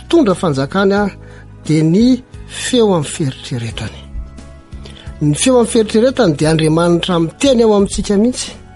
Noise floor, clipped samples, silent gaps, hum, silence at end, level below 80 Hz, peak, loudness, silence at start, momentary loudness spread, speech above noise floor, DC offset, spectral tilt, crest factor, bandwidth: -34 dBFS; under 0.1%; none; none; 0.05 s; -34 dBFS; 0 dBFS; -14 LUFS; 0 s; 19 LU; 21 dB; under 0.1%; -5.5 dB/octave; 12 dB; 11.5 kHz